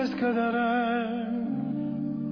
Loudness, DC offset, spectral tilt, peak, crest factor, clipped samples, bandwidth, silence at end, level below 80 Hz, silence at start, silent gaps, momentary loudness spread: -28 LUFS; under 0.1%; -8 dB/octave; -16 dBFS; 12 dB; under 0.1%; 5.4 kHz; 0 s; -62 dBFS; 0 s; none; 5 LU